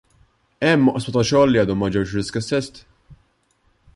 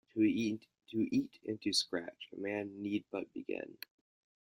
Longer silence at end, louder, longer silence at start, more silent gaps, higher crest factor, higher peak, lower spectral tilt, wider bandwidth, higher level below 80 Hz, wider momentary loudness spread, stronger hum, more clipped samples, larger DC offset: about the same, 0.8 s vs 0.75 s; first, -19 LUFS vs -37 LUFS; first, 0.6 s vs 0.15 s; neither; about the same, 16 dB vs 18 dB; first, -4 dBFS vs -20 dBFS; first, -6 dB/octave vs -4 dB/octave; second, 11.5 kHz vs 16 kHz; first, -46 dBFS vs -76 dBFS; second, 9 LU vs 13 LU; neither; neither; neither